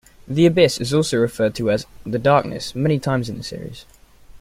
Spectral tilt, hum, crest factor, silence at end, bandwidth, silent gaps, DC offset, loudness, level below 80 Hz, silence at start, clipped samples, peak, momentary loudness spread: -6 dB/octave; none; 18 dB; 0.05 s; 16 kHz; none; under 0.1%; -19 LUFS; -46 dBFS; 0.2 s; under 0.1%; -2 dBFS; 13 LU